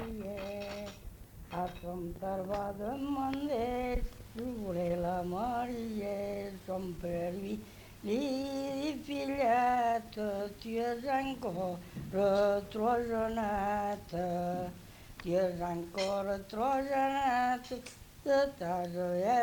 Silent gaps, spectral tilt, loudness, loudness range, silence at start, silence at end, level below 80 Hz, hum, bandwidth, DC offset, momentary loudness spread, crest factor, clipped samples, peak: none; -6 dB/octave; -35 LUFS; 5 LU; 0 s; 0 s; -52 dBFS; none; 19 kHz; under 0.1%; 12 LU; 16 dB; under 0.1%; -18 dBFS